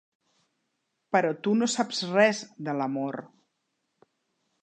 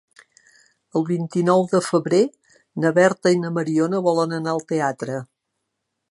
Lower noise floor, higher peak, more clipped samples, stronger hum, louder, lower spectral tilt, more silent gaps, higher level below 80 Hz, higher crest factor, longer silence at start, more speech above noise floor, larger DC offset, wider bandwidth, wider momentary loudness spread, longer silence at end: about the same, -79 dBFS vs -78 dBFS; second, -8 dBFS vs -2 dBFS; neither; neither; second, -27 LUFS vs -21 LUFS; second, -4 dB/octave vs -6 dB/octave; neither; second, -82 dBFS vs -72 dBFS; about the same, 20 dB vs 20 dB; first, 1.1 s vs 0.95 s; second, 53 dB vs 58 dB; neither; second, 9.4 kHz vs 11.5 kHz; about the same, 11 LU vs 9 LU; first, 1.35 s vs 0.85 s